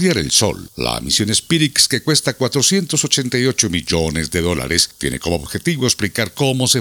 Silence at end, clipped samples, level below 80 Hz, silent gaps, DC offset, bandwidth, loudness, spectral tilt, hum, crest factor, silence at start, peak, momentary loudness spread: 0 s; under 0.1%; -40 dBFS; none; under 0.1%; over 20 kHz; -16 LUFS; -3 dB/octave; none; 18 dB; 0 s; 0 dBFS; 7 LU